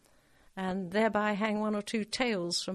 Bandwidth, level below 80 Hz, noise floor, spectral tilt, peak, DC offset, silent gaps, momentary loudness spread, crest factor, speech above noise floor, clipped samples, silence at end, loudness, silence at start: 13 kHz; -64 dBFS; -63 dBFS; -4.5 dB/octave; -14 dBFS; under 0.1%; none; 7 LU; 18 dB; 31 dB; under 0.1%; 0 s; -31 LUFS; 0.55 s